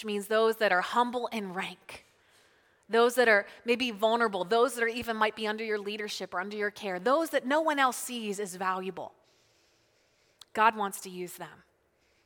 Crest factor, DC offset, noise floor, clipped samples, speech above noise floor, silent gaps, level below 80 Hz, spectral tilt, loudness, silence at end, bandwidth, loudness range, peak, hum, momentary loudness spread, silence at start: 22 dB; under 0.1%; -70 dBFS; under 0.1%; 41 dB; none; -74 dBFS; -3 dB/octave; -29 LUFS; 0.7 s; 19 kHz; 6 LU; -10 dBFS; none; 14 LU; 0 s